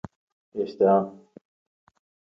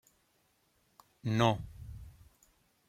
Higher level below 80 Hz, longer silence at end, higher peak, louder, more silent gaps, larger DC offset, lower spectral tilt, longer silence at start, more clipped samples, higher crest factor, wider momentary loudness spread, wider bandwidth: second, -66 dBFS vs -58 dBFS; first, 1.2 s vs 0.8 s; first, -8 dBFS vs -12 dBFS; first, -24 LUFS vs -32 LUFS; neither; neither; first, -9.5 dB/octave vs -6.5 dB/octave; second, 0.55 s vs 1.25 s; neither; second, 20 dB vs 26 dB; second, 18 LU vs 22 LU; second, 6 kHz vs 15 kHz